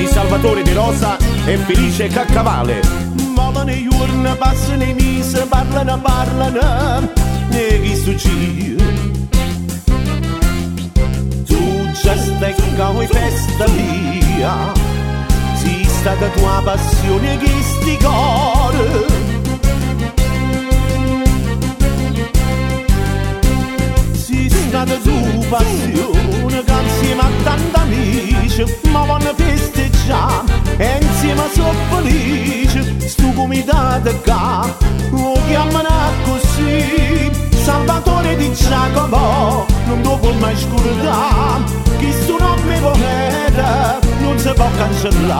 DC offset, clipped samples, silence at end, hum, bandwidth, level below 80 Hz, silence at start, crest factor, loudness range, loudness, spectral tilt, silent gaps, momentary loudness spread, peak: under 0.1%; under 0.1%; 0 s; none; 17 kHz; -18 dBFS; 0 s; 14 dB; 2 LU; -15 LUFS; -5.5 dB/octave; none; 3 LU; 0 dBFS